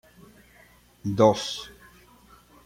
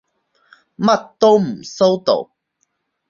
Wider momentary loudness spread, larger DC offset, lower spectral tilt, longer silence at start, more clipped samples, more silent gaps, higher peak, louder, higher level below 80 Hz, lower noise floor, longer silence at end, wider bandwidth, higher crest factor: first, 16 LU vs 9 LU; neither; about the same, -5.5 dB/octave vs -5.5 dB/octave; first, 1.05 s vs 0.8 s; neither; neither; about the same, -4 dBFS vs -2 dBFS; second, -24 LUFS vs -16 LUFS; about the same, -60 dBFS vs -64 dBFS; second, -56 dBFS vs -69 dBFS; about the same, 0.95 s vs 0.85 s; first, 16 kHz vs 7.4 kHz; first, 24 dB vs 16 dB